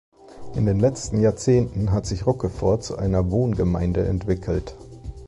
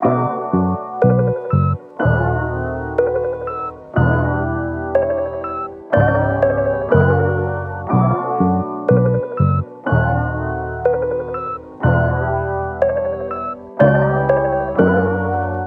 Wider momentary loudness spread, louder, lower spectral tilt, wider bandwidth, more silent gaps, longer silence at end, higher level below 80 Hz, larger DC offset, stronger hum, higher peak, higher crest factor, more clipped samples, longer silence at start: about the same, 8 LU vs 8 LU; second, -22 LUFS vs -18 LUFS; second, -7.5 dB/octave vs -11.5 dB/octave; first, 11.5 kHz vs 3.4 kHz; neither; about the same, 0 s vs 0 s; about the same, -34 dBFS vs -34 dBFS; neither; neither; second, -8 dBFS vs 0 dBFS; about the same, 14 dB vs 16 dB; neither; first, 0.25 s vs 0 s